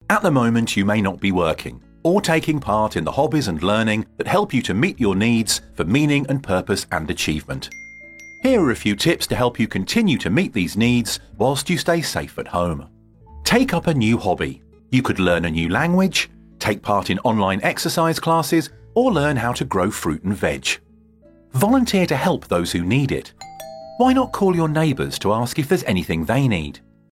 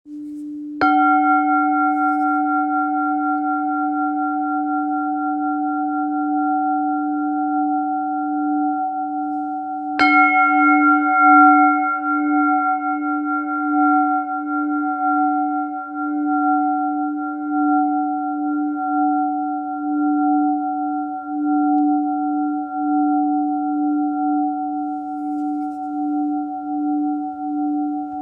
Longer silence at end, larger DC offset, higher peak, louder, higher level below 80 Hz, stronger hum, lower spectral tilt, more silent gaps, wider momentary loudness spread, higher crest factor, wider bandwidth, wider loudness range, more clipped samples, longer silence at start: first, 0.35 s vs 0 s; neither; about the same, -2 dBFS vs -2 dBFS; about the same, -20 LUFS vs -19 LUFS; first, -44 dBFS vs -68 dBFS; neither; about the same, -5 dB/octave vs -6 dB/octave; neither; about the same, 8 LU vs 10 LU; about the same, 18 dB vs 18 dB; first, 16.5 kHz vs 5.4 kHz; second, 2 LU vs 7 LU; neither; about the same, 0.1 s vs 0.05 s